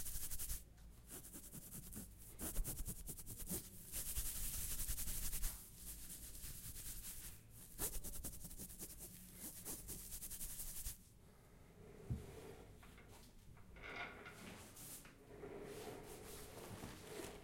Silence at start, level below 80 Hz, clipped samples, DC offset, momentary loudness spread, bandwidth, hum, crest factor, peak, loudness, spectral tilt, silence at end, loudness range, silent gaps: 0 s; -54 dBFS; under 0.1%; under 0.1%; 17 LU; 16.5 kHz; none; 22 dB; -28 dBFS; -49 LUFS; -3 dB/octave; 0 s; 9 LU; none